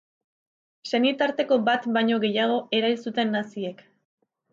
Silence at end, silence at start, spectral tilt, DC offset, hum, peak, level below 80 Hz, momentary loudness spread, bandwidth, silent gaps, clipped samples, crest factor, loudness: 0.8 s; 0.85 s; -5.5 dB/octave; under 0.1%; none; -10 dBFS; -76 dBFS; 10 LU; 7.6 kHz; none; under 0.1%; 16 dB; -24 LUFS